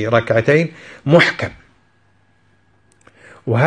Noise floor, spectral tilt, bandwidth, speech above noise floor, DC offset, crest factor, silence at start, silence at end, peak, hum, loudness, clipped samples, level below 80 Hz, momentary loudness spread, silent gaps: -58 dBFS; -6.5 dB/octave; 10 kHz; 42 dB; under 0.1%; 18 dB; 0 s; 0 s; 0 dBFS; none; -16 LUFS; under 0.1%; -54 dBFS; 15 LU; none